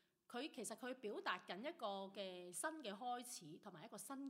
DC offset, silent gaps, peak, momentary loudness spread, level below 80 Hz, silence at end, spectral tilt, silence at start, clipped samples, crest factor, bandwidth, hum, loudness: under 0.1%; none; -28 dBFS; 8 LU; under -90 dBFS; 0 s; -2.5 dB/octave; 0.3 s; under 0.1%; 22 dB; 16 kHz; none; -50 LUFS